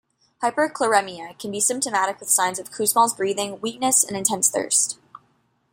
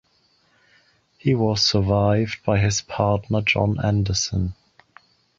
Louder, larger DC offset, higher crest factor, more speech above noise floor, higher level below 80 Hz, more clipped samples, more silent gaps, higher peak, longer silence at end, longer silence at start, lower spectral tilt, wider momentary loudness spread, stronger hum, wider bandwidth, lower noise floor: about the same, -21 LUFS vs -21 LUFS; neither; about the same, 20 dB vs 18 dB; about the same, 43 dB vs 42 dB; second, -68 dBFS vs -40 dBFS; neither; neither; about the same, -2 dBFS vs -4 dBFS; about the same, 0.8 s vs 0.85 s; second, 0.4 s vs 1.25 s; second, -1.5 dB/octave vs -5 dB/octave; first, 9 LU vs 6 LU; neither; first, 16.5 kHz vs 7.8 kHz; about the same, -65 dBFS vs -63 dBFS